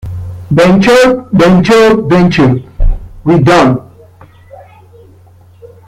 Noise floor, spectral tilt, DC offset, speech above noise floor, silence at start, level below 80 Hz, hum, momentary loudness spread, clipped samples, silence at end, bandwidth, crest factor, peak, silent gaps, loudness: -39 dBFS; -6.5 dB/octave; under 0.1%; 33 dB; 0.05 s; -22 dBFS; none; 13 LU; under 0.1%; 0.2 s; 14 kHz; 10 dB; 0 dBFS; none; -8 LUFS